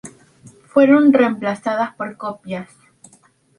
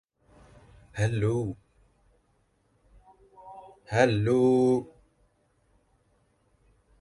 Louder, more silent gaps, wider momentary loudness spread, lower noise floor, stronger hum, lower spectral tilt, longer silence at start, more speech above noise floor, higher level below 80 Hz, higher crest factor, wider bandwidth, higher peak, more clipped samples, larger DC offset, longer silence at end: first, -16 LUFS vs -26 LUFS; neither; second, 18 LU vs 26 LU; second, -54 dBFS vs -69 dBFS; neither; about the same, -6.5 dB/octave vs -7 dB/octave; second, 0.05 s vs 0.95 s; second, 38 dB vs 45 dB; second, -64 dBFS vs -56 dBFS; second, 16 dB vs 22 dB; about the same, 11 kHz vs 11.5 kHz; first, -2 dBFS vs -8 dBFS; neither; neither; second, 0.95 s vs 2.15 s